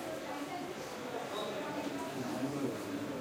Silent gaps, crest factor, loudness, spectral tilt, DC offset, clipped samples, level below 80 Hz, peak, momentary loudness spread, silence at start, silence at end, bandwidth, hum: none; 16 dB; -40 LUFS; -4.5 dB/octave; under 0.1%; under 0.1%; -74 dBFS; -24 dBFS; 4 LU; 0 s; 0 s; 16.5 kHz; none